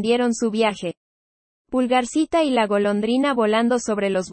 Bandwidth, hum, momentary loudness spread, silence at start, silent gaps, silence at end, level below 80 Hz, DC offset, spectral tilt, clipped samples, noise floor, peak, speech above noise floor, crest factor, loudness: 8.8 kHz; none; 4 LU; 0 s; 0.97-1.65 s; 0 s; -58 dBFS; under 0.1%; -4.5 dB/octave; under 0.1%; under -90 dBFS; -6 dBFS; over 70 dB; 14 dB; -20 LUFS